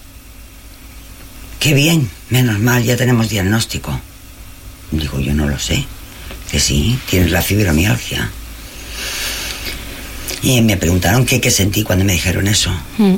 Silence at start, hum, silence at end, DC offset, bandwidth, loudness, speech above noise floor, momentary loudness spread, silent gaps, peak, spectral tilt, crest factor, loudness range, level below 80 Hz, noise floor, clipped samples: 0 s; none; 0 s; under 0.1%; 17 kHz; -15 LUFS; 22 dB; 19 LU; none; -2 dBFS; -4.5 dB/octave; 14 dB; 5 LU; -30 dBFS; -36 dBFS; under 0.1%